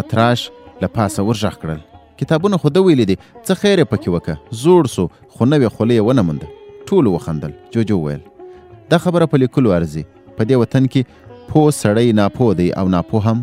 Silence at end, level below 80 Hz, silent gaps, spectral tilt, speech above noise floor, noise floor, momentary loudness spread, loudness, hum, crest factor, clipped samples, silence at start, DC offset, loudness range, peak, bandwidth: 0 s; -44 dBFS; none; -7 dB/octave; 23 dB; -38 dBFS; 12 LU; -16 LUFS; none; 16 dB; under 0.1%; 0 s; under 0.1%; 3 LU; 0 dBFS; 15.5 kHz